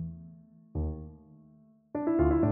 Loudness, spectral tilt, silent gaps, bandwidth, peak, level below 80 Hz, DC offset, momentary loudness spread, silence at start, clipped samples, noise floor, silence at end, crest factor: -31 LUFS; -11.5 dB/octave; none; 3 kHz; -14 dBFS; -42 dBFS; under 0.1%; 23 LU; 0 s; under 0.1%; -60 dBFS; 0 s; 18 dB